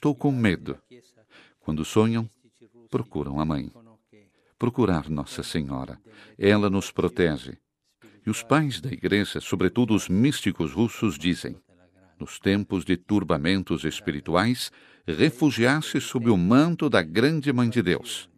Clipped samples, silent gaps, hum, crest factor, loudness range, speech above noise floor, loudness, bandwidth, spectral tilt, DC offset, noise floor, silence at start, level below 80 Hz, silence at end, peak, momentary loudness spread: under 0.1%; none; none; 22 dB; 7 LU; 35 dB; -25 LUFS; 14.5 kHz; -6 dB/octave; under 0.1%; -59 dBFS; 0 s; -52 dBFS; 0.15 s; -4 dBFS; 12 LU